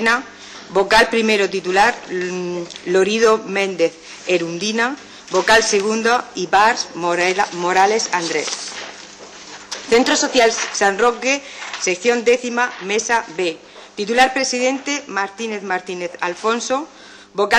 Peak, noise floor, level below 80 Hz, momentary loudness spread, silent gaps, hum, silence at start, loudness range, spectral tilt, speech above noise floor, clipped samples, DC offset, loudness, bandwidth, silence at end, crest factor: -6 dBFS; -38 dBFS; -52 dBFS; 15 LU; none; none; 0 s; 3 LU; -2.5 dB/octave; 20 dB; under 0.1%; under 0.1%; -17 LUFS; 15.5 kHz; 0 s; 14 dB